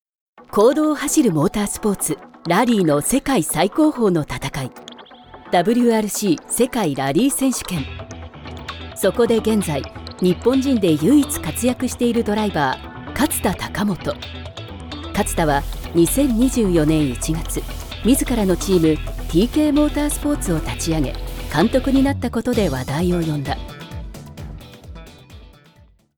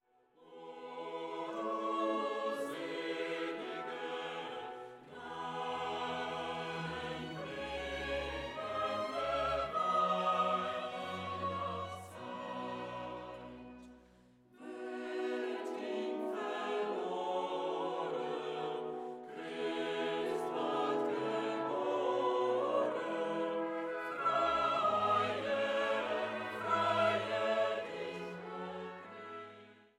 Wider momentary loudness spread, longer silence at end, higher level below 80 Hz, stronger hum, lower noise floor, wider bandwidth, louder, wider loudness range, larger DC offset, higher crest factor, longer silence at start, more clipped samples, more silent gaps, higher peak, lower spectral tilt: about the same, 16 LU vs 14 LU; first, 0.7 s vs 0.15 s; first, -34 dBFS vs -66 dBFS; neither; second, -51 dBFS vs -65 dBFS; first, over 20 kHz vs 14.5 kHz; first, -19 LUFS vs -37 LUFS; second, 4 LU vs 8 LU; neither; about the same, 16 dB vs 16 dB; about the same, 0.4 s vs 0.4 s; neither; neither; first, -4 dBFS vs -20 dBFS; about the same, -5 dB/octave vs -5 dB/octave